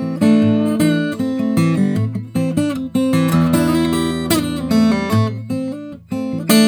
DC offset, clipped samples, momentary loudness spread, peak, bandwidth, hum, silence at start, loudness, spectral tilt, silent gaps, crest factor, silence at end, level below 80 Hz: under 0.1%; under 0.1%; 9 LU; 0 dBFS; over 20 kHz; none; 0 s; -17 LUFS; -6 dB/octave; none; 16 dB; 0 s; -44 dBFS